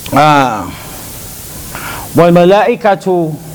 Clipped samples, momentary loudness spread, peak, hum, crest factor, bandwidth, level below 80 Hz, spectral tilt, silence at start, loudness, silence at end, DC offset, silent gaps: 0.7%; 18 LU; 0 dBFS; none; 12 dB; over 20 kHz; -38 dBFS; -5.5 dB/octave; 0 s; -10 LUFS; 0 s; under 0.1%; none